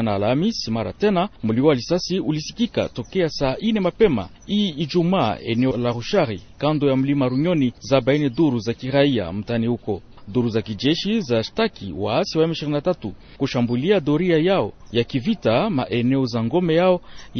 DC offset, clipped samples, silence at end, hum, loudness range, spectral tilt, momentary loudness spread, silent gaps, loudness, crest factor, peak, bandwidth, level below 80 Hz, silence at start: under 0.1%; under 0.1%; 0 s; none; 2 LU; -6.5 dB/octave; 7 LU; none; -21 LUFS; 16 dB; -4 dBFS; 6.6 kHz; -46 dBFS; 0 s